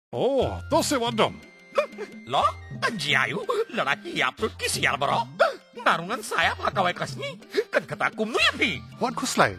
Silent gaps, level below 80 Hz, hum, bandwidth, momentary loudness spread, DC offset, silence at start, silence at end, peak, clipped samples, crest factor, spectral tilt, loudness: none; -50 dBFS; none; 16 kHz; 7 LU; under 0.1%; 0.1 s; 0 s; -4 dBFS; under 0.1%; 22 dB; -3.5 dB/octave; -25 LUFS